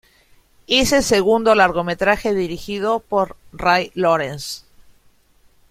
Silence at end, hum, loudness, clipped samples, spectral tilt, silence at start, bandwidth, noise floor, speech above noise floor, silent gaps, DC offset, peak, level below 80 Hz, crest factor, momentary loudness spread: 1.15 s; none; -18 LUFS; under 0.1%; -3.5 dB/octave; 0.7 s; 16 kHz; -55 dBFS; 37 dB; none; under 0.1%; -2 dBFS; -44 dBFS; 18 dB; 11 LU